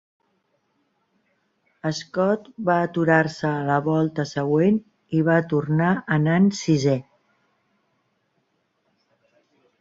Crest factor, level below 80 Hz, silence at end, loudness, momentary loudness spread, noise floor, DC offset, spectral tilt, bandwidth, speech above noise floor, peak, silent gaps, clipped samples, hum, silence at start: 20 dB; -62 dBFS; 2.8 s; -22 LUFS; 7 LU; -70 dBFS; under 0.1%; -7 dB/octave; 7.8 kHz; 50 dB; -4 dBFS; none; under 0.1%; none; 1.85 s